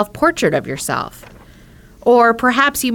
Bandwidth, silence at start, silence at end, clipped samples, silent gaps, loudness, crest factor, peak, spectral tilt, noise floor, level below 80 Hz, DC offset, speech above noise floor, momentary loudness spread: 19 kHz; 0 s; 0 s; under 0.1%; none; -15 LUFS; 14 dB; -2 dBFS; -4 dB/octave; -43 dBFS; -46 dBFS; under 0.1%; 28 dB; 10 LU